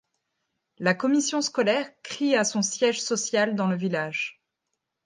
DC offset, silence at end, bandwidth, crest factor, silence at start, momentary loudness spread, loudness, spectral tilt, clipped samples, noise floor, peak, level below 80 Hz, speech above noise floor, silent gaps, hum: under 0.1%; 0.75 s; 10.5 kHz; 20 dB; 0.8 s; 6 LU; -25 LUFS; -3.5 dB/octave; under 0.1%; -82 dBFS; -6 dBFS; -78 dBFS; 57 dB; none; none